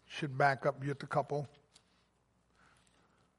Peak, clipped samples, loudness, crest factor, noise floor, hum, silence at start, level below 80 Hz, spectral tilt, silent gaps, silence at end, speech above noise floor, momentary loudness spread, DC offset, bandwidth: -16 dBFS; under 0.1%; -35 LUFS; 24 dB; -74 dBFS; none; 0.1 s; -76 dBFS; -6.5 dB/octave; none; 1.9 s; 40 dB; 10 LU; under 0.1%; 11.5 kHz